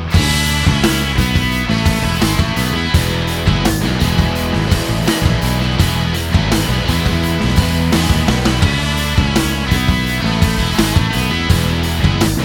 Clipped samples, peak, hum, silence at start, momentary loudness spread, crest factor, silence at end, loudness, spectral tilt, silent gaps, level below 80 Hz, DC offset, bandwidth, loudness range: under 0.1%; 0 dBFS; none; 0 s; 2 LU; 14 dB; 0 s; -15 LUFS; -5 dB/octave; none; -22 dBFS; under 0.1%; 18.5 kHz; 1 LU